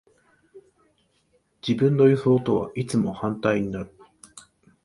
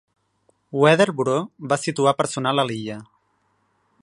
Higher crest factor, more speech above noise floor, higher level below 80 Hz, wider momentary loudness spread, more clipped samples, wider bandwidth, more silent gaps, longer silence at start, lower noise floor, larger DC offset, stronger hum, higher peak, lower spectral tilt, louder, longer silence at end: about the same, 20 dB vs 22 dB; about the same, 45 dB vs 47 dB; first, -56 dBFS vs -66 dBFS; about the same, 15 LU vs 14 LU; neither; about the same, 11.5 kHz vs 11.5 kHz; neither; second, 0.55 s vs 0.75 s; about the same, -67 dBFS vs -67 dBFS; neither; neither; second, -6 dBFS vs 0 dBFS; first, -7.5 dB/octave vs -5 dB/octave; about the same, -23 LUFS vs -21 LUFS; second, 0.45 s vs 1 s